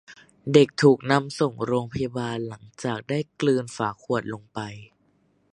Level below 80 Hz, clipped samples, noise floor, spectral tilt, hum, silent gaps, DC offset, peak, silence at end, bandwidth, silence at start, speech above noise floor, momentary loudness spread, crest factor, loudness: -60 dBFS; under 0.1%; -65 dBFS; -6 dB/octave; none; none; under 0.1%; -2 dBFS; 0.7 s; 11 kHz; 0.1 s; 41 dB; 17 LU; 22 dB; -24 LUFS